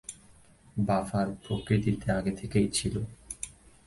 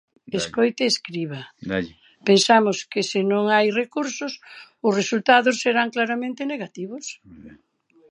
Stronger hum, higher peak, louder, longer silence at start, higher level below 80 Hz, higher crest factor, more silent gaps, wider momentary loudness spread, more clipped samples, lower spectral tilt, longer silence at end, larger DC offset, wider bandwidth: neither; second, -12 dBFS vs -2 dBFS; second, -30 LUFS vs -21 LUFS; second, 0.1 s vs 0.3 s; first, -48 dBFS vs -62 dBFS; about the same, 20 dB vs 20 dB; neither; second, 12 LU vs 16 LU; neither; first, -5.5 dB/octave vs -3.5 dB/octave; second, 0.35 s vs 0.55 s; neither; about the same, 11.5 kHz vs 11.5 kHz